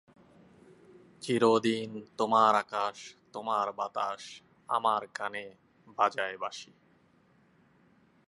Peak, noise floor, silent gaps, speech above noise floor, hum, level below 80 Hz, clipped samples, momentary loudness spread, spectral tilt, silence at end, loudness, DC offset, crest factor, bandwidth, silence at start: -10 dBFS; -65 dBFS; none; 35 dB; none; -80 dBFS; under 0.1%; 20 LU; -4.5 dB/octave; 1.65 s; -30 LUFS; under 0.1%; 22 dB; 11.5 kHz; 1.2 s